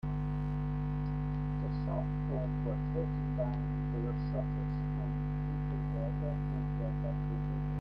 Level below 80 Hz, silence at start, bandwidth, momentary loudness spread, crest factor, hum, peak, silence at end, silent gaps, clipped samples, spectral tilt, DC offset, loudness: -42 dBFS; 0.05 s; 5 kHz; 1 LU; 12 dB; 50 Hz at -35 dBFS; -22 dBFS; 0 s; none; under 0.1%; -11 dB/octave; under 0.1%; -36 LUFS